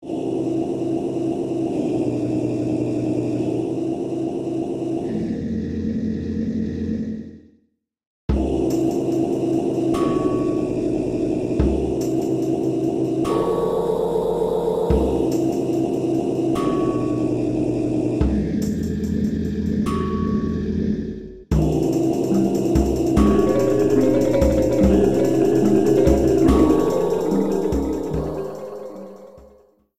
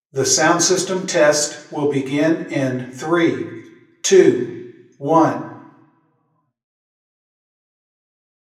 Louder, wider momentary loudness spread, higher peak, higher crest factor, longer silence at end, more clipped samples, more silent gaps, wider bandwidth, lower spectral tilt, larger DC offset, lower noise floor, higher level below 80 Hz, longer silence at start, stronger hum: second, -21 LUFS vs -17 LUFS; second, 8 LU vs 16 LU; second, -4 dBFS vs 0 dBFS; about the same, 16 dB vs 20 dB; second, 0.5 s vs 2.85 s; neither; first, 8.07-8.28 s vs none; about the same, 14.5 kHz vs 15 kHz; first, -8 dB/octave vs -3.5 dB/octave; neither; about the same, -66 dBFS vs -67 dBFS; first, -32 dBFS vs -72 dBFS; second, 0 s vs 0.15 s; neither